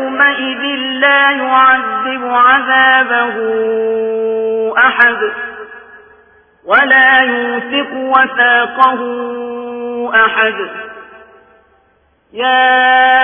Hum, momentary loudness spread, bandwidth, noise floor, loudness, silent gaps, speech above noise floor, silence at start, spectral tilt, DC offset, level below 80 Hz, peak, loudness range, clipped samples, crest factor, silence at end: none; 14 LU; 5.4 kHz; -54 dBFS; -11 LUFS; none; 43 dB; 0 s; -5.5 dB/octave; under 0.1%; -56 dBFS; 0 dBFS; 5 LU; under 0.1%; 12 dB; 0 s